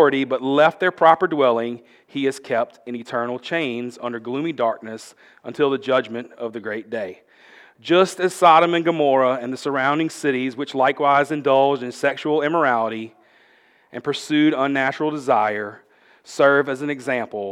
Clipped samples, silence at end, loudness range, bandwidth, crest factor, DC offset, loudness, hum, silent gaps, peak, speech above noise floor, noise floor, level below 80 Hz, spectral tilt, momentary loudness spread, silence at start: under 0.1%; 0 s; 7 LU; 14.5 kHz; 20 dB; under 0.1%; -20 LUFS; none; none; 0 dBFS; 36 dB; -56 dBFS; -78 dBFS; -5 dB/octave; 15 LU; 0 s